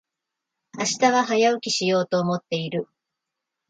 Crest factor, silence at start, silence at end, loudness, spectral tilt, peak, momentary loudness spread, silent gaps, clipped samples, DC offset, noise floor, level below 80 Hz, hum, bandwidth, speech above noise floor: 20 dB; 0.75 s; 0.85 s; -22 LUFS; -4 dB/octave; -6 dBFS; 10 LU; none; under 0.1%; under 0.1%; -84 dBFS; -72 dBFS; none; 9.4 kHz; 62 dB